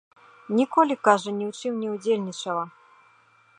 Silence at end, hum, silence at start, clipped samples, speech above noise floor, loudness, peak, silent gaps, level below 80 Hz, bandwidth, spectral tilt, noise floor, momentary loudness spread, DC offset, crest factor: 0.9 s; none; 0.5 s; under 0.1%; 35 dB; -24 LUFS; -4 dBFS; none; -82 dBFS; 10 kHz; -5 dB/octave; -59 dBFS; 10 LU; under 0.1%; 22 dB